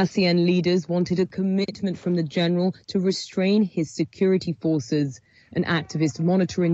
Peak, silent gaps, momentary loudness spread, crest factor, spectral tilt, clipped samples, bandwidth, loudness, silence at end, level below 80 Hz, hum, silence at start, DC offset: -10 dBFS; none; 6 LU; 14 dB; -6.5 dB/octave; under 0.1%; 8 kHz; -23 LUFS; 0 s; -60 dBFS; none; 0 s; under 0.1%